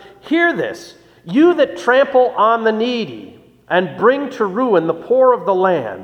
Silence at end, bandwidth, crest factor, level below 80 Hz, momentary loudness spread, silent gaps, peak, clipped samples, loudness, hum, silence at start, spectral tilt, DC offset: 0 s; 8.8 kHz; 16 dB; -62 dBFS; 9 LU; none; 0 dBFS; under 0.1%; -15 LUFS; none; 0.25 s; -6 dB/octave; under 0.1%